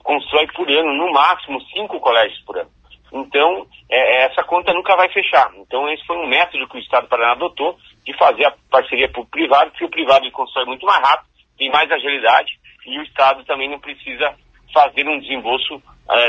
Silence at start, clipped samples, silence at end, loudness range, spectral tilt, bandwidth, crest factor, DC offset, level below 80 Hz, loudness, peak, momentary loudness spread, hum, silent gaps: 0.05 s; under 0.1%; 0 s; 2 LU; -3.5 dB/octave; 8 kHz; 16 dB; under 0.1%; -54 dBFS; -16 LUFS; 0 dBFS; 12 LU; none; none